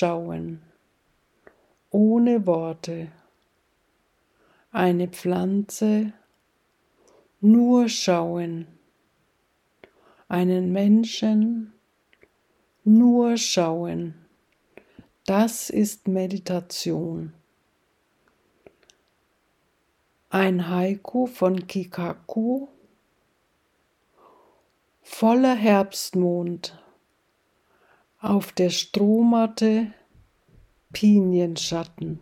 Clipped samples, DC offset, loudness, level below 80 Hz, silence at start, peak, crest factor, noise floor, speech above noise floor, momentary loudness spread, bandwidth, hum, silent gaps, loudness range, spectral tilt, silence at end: under 0.1%; under 0.1%; -22 LUFS; -66 dBFS; 0 s; -6 dBFS; 18 dB; -68 dBFS; 47 dB; 15 LU; 15.5 kHz; none; none; 8 LU; -5.5 dB/octave; 0.05 s